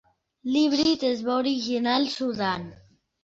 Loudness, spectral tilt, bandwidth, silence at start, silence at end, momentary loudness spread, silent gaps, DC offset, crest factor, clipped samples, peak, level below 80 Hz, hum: -25 LUFS; -4.5 dB/octave; 7.8 kHz; 0.45 s; 0.5 s; 9 LU; none; under 0.1%; 16 dB; under 0.1%; -10 dBFS; -62 dBFS; none